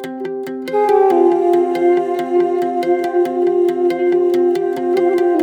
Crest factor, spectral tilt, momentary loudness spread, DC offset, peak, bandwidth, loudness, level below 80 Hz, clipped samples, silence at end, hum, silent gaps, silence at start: 12 dB; -6 dB/octave; 5 LU; under 0.1%; -2 dBFS; 8.8 kHz; -16 LUFS; -66 dBFS; under 0.1%; 0 s; none; none; 0 s